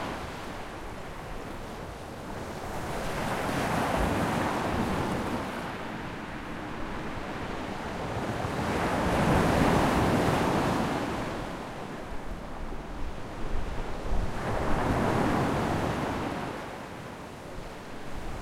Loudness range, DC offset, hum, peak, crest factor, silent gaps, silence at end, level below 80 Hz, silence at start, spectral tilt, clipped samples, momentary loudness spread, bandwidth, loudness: 9 LU; under 0.1%; none; -12 dBFS; 18 dB; none; 0 s; -40 dBFS; 0 s; -6 dB/octave; under 0.1%; 15 LU; 16.5 kHz; -31 LUFS